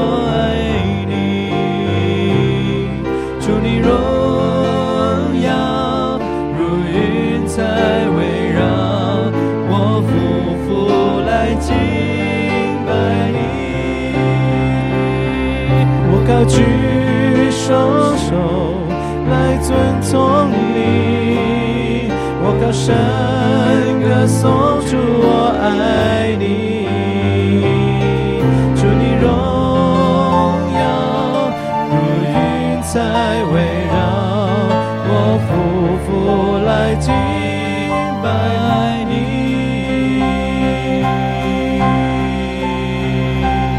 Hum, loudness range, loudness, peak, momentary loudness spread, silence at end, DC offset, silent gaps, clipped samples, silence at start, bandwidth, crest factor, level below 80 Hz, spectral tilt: none; 3 LU; -15 LUFS; 0 dBFS; 5 LU; 0 s; under 0.1%; none; under 0.1%; 0 s; 13 kHz; 14 dB; -30 dBFS; -7 dB/octave